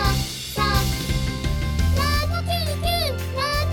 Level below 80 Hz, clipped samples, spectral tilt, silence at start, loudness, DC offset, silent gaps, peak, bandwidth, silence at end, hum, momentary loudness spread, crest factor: -28 dBFS; under 0.1%; -4.5 dB/octave; 0 s; -23 LUFS; under 0.1%; none; -6 dBFS; 18.5 kHz; 0 s; none; 4 LU; 16 dB